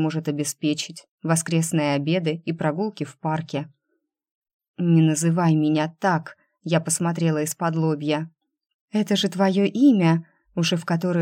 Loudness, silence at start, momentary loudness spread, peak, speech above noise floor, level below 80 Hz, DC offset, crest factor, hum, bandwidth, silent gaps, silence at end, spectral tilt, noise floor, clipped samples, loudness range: -22 LUFS; 0 s; 11 LU; -6 dBFS; 54 dB; -72 dBFS; under 0.1%; 16 dB; none; 16 kHz; 1.08-1.18 s, 4.31-4.42 s, 4.53-4.59 s, 4.68-4.74 s, 8.74-8.88 s; 0 s; -5.5 dB/octave; -75 dBFS; under 0.1%; 3 LU